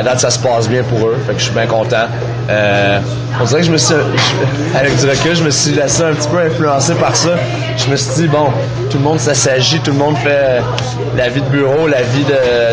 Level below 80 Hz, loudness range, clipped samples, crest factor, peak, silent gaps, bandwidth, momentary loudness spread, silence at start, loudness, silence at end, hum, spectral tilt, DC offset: -38 dBFS; 1 LU; under 0.1%; 12 dB; 0 dBFS; none; 10 kHz; 4 LU; 0 s; -12 LUFS; 0 s; none; -4.5 dB/octave; under 0.1%